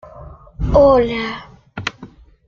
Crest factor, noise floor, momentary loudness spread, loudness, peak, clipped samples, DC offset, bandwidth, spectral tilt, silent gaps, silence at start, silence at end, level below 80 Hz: 18 dB; -41 dBFS; 19 LU; -16 LUFS; 0 dBFS; under 0.1%; under 0.1%; 7.2 kHz; -6.5 dB/octave; none; 0.05 s; 0.4 s; -30 dBFS